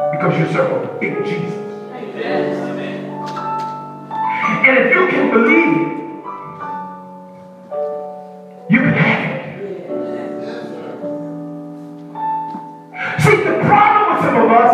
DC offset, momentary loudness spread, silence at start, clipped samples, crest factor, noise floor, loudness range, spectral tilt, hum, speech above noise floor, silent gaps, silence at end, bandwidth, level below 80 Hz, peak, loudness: under 0.1%; 19 LU; 0 s; under 0.1%; 16 dB; -37 dBFS; 10 LU; -7 dB/octave; none; 23 dB; none; 0 s; 14.5 kHz; -62 dBFS; 0 dBFS; -16 LUFS